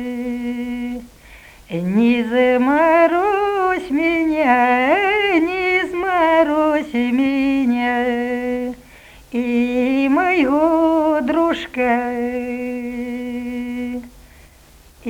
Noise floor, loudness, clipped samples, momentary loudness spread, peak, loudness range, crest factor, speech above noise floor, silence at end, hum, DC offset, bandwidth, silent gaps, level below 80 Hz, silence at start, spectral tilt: -47 dBFS; -18 LUFS; under 0.1%; 11 LU; -2 dBFS; 5 LU; 16 dB; 32 dB; 0 s; none; under 0.1%; 17 kHz; none; -48 dBFS; 0 s; -6 dB/octave